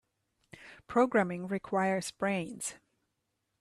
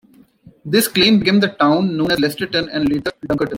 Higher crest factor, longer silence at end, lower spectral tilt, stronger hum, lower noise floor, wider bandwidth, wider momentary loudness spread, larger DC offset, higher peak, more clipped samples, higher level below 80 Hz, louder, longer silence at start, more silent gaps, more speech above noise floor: about the same, 20 dB vs 16 dB; first, 0.85 s vs 0 s; about the same, -5 dB/octave vs -4.5 dB/octave; neither; first, -82 dBFS vs -47 dBFS; second, 13 kHz vs 16.5 kHz; first, 12 LU vs 9 LU; neither; second, -14 dBFS vs -2 dBFS; neither; second, -72 dBFS vs -48 dBFS; second, -32 LUFS vs -16 LUFS; about the same, 0.6 s vs 0.65 s; neither; first, 51 dB vs 31 dB